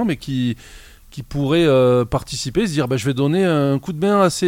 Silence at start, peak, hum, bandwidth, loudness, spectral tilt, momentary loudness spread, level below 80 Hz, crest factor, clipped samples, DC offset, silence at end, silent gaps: 0 s; -2 dBFS; none; 16.5 kHz; -18 LUFS; -6 dB/octave; 11 LU; -42 dBFS; 16 dB; under 0.1%; under 0.1%; 0 s; none